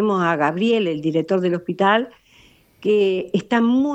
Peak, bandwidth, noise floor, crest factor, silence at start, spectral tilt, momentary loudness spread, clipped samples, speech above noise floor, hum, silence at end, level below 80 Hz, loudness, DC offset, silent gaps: -4 dBFS; 8.4 kHz; -53 dBFS; 16 dB; 0 s; -7 dB/octave; 5 LU; under 0.1%; 34 dB; none; 0 s; -62 dBFS; -19 LUFS; under 0.1%; none